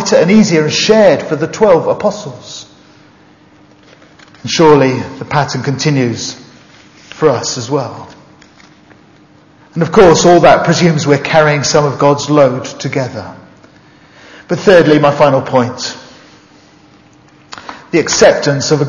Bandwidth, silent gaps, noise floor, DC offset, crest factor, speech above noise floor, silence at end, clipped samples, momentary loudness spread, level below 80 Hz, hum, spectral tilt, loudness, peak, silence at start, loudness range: 7.6 kHz; none; -44 dBFS; under 0.1%; 12 dB; 34 dB; 0 s; 0.5%; 19 LU; -44 dBFS; none; -5 dB/octave; -10 LUFS; 0 dBFS; 0 s; 8 LU